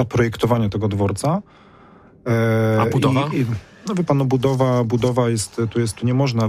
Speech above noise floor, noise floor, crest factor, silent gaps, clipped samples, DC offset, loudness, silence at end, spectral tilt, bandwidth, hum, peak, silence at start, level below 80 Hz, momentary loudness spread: 29 dB; -47 dBFS; 14 dB; none; under 0.1%; under 0.1%; -19 LUFS; 0 s; -6.5 dB/octave; 15.5 kHz; none; -6 dBFS; 0 s; -48 dBFS; 6 LU